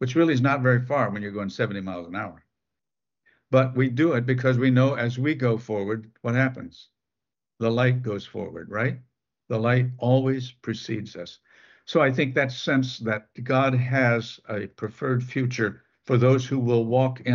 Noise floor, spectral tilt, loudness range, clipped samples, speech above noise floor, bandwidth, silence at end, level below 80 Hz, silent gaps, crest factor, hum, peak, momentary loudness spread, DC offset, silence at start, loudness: under -90 dBFS; -7.5 dB/octave; 4 LU; under 0.1%; over 66 dB; 7 kHz; 0 s; -66 dBFS; none; 18 dB; none; -6 dBFS; 12 LU; under 0.1%; 0 s; -24 LUFS